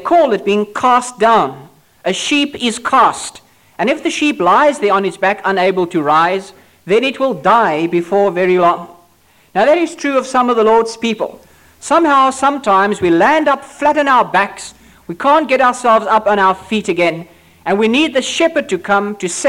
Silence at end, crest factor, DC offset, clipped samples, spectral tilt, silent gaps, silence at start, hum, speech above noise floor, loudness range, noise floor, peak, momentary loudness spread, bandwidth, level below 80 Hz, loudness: 0 s; 10 dB; under 0.1%; under 0.1%; -4 dB/octave; none; 0 s; none; 38 dB; 2 LU; -51 dBFS; -2 dBFS; 9 LU; 16.5 kHz; -54 dBFS; -13 LUFS